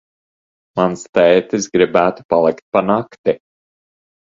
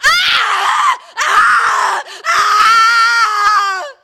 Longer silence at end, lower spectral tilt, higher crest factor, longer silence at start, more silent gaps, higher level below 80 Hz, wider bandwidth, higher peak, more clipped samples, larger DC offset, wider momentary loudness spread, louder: first, 0.95 s vs 0.1 s; first, -5 dB/octave vs 2 dB/octave; first, 18 dB vs 12 dB; first, 0.75 s vs 0 s; first, 1.09-1.13 s, 2.25-2.29 s, 2.62-2.72 s, 3.18-3.24 s vs none; about the same, -54 dBFS vs -50 dBFS; second, 7.6 kHz vs 17.5 kHz; about the same, 0 dBFS vs 0 dBFS; neither; neither; about the same, 8 LU vs 8 LU; second, -16 LUFS vs -11 LUFS